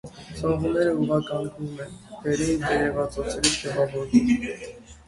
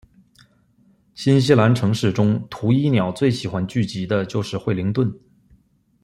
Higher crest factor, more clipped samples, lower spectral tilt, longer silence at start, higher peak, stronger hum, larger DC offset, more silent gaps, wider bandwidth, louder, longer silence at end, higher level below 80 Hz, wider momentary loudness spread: about the same, 20 dB vs 18 dB; neither; second, -4.5 dB/octave vs -7 dB/octave; second, 0.05 s vs 1.15 s; second, -6 dBFS vs -2 dBFS; neither; neither; neither; about the same, 11.5 kHz vs 12.5 kHz; second, -25 LUFS vs -20 LUFS; second, 0.1 s vs 0.85 s; first, -46 dBFS vs -54 dBFS; first, 14 LU vs 9 LU